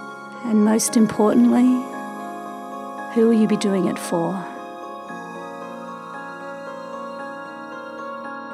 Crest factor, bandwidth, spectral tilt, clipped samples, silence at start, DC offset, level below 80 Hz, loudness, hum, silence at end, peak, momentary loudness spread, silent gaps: 16 dB; 15 kHz; -5.5 dB/octave; under 0.1%; 0 s; under 0.1%; -70 dBFS; -20 LUFS; none; 0 s; -6 dBFS; 17 LU; none